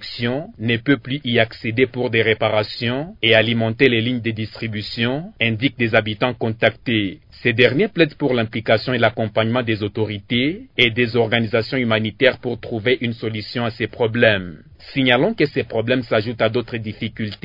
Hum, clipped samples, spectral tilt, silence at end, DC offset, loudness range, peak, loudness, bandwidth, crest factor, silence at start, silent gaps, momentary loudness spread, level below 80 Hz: none; under 0.1%; -8 dB/octave; 0.1 s; under 0.1%; 2 LU; 0 dBFS; -19 LUFS; 6 kHz; 20 dB; 0 s; none; 9 LU; -52 dBFS